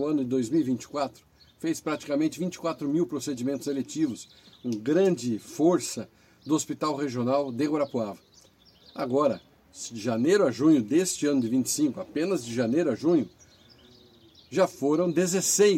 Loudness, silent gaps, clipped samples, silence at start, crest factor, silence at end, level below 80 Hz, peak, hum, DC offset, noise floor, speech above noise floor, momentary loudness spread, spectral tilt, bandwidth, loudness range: -27 LUFS; none; under 0.1%; 0 s; 18 dB; 0 s; -68 dBFS; -10 dBFS; none; under 0.1%; -58 dBFS; 32 dB; 12 LU; -5 dB/octave; 16 kHz; 5 LU